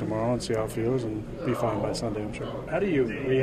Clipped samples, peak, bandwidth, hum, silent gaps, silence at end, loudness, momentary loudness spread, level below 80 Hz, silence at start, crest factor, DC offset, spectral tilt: under 0.1%; -14 dBFS; 15 kHz; none; none; 0 s; -29 LUFS; 7 LU; -46 dBFS; 0 s; 14 dB; under 0.1%; -6.5 dB/octave